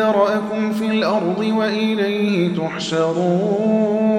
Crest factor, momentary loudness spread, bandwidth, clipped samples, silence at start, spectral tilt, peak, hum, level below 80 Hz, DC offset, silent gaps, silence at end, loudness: 14 dB; 3 LU; 10.5 kHz; under 0.1%; 0 s; -6.5 dB/octave; -4 dBFS; none; -62 dBFS; under 0.1%; none; 0 s; -19 LUFS